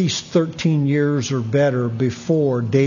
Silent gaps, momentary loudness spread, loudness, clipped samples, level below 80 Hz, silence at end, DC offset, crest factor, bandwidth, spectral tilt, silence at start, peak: none; 3 LU; -19 LUFS; under 0.1%; -56 dBFS; 0 s; under 0.1%; 14 dB; 7.4 kHz; -6.5 dB/octave; 0 s; -4 dBFS